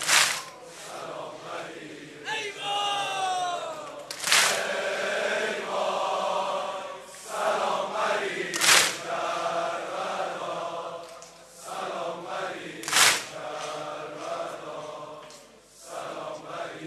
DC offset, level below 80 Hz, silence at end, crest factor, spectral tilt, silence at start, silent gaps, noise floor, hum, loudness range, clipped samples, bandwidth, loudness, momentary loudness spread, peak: under 0.1%; -72 dBFS; 0 s; 26 dB; 0 dB/octave; 0 s; none; -51 dBFS; none; 8 LU; under 0.1%; 13 kHz; -27 LUFS; 19 LU; -2 dBFS